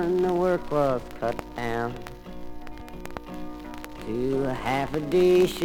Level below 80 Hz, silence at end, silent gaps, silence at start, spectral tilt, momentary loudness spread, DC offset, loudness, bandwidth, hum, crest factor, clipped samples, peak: -44 dBFS; 0 s; none; 0 s; -6.5 dB/octave; 20 LU; under 0.1%; -26 LUFS; 17.5 kHz; none; 16 dB; under 0.1%; -10 dBFS